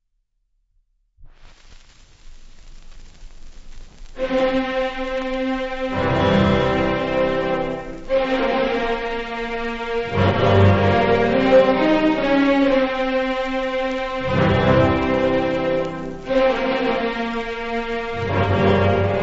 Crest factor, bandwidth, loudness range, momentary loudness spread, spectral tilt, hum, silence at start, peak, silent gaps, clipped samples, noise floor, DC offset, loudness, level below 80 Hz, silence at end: 16 dB; 7.8 kHz; 8 LU; 10 LU; -7.5 dB/octave; none; 1.2 s; -4 dBFS; none; under 0.1%; -69 dBFS; under 0.1%; -19 LUFS; -38 dBFS; 0 s